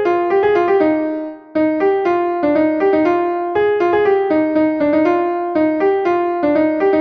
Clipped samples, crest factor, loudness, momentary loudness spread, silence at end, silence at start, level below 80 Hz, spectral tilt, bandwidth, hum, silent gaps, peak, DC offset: under 0.1%; 12 dB; -16 LUFS; 4 LU; 0 s; 0 s; -54 dBFS; -7.5 dB/octave; 6.2 kHz; none; none; -4 dBFS; under 0.1%